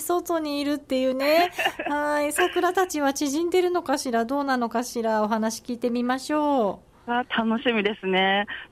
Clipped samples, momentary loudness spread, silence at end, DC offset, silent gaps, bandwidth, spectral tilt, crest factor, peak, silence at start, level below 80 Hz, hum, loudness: under 0.1%; 6 LU; 0.05 s; under 0.1%; none; 16 kHz; -3.5 dB/octave; 14 dB; -10 dBFS; 0 s; -60 dBFS; none; -24 LUFS